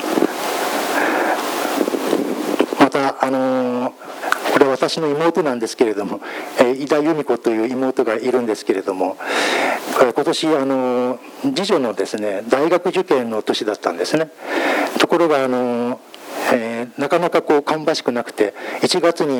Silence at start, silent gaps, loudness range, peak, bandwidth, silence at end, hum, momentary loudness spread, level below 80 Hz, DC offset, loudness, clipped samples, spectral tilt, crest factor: 0 s; none; 1 LU; 0 dBFS; over 20 kHz; 0 s; none; 7 LU; -70 dBFS; under 0.1%; -18 LUFS; under 0.1%; -4 dB/octave; 18 dB